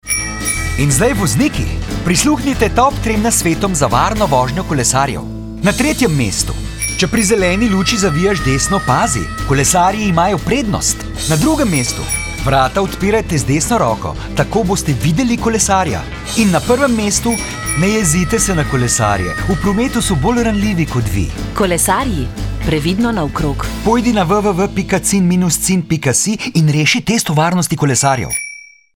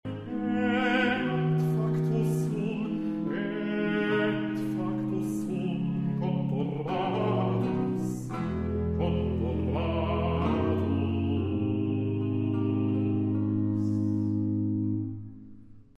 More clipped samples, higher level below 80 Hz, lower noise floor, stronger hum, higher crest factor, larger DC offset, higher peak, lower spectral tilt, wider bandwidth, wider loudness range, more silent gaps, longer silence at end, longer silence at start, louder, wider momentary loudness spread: neither; first, -28 dBFS vs -48 dBFS; second, -34 dBFS vs -48 dBFS; neither; about the same, 14 dB vs 14 dB; neither; first, 0 dBFS vs -14 dBFS; second, -4.5 dB/octave vs -8 dB/octave; first, 19 kHz vs 13.5 kHz; about the same, 2 LU vs 2 LU; neither; first, 0.3 s vs 0.15 s; about the same, 0.05 s vs 0.05 s; first, -14 LUFS vs -29 LUFS; about the same, 6 LU vs 4 LU